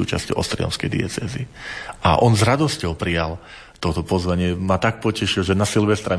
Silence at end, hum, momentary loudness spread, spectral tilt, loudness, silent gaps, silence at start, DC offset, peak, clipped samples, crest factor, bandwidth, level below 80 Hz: 0 s; none; 13 LU; -5.5 dB/octave; -21 LUFS; none; 0 s; under 0.1%; -4 dBFS; under 0.1%; 18 dB; 11 kHz; -38 dBFS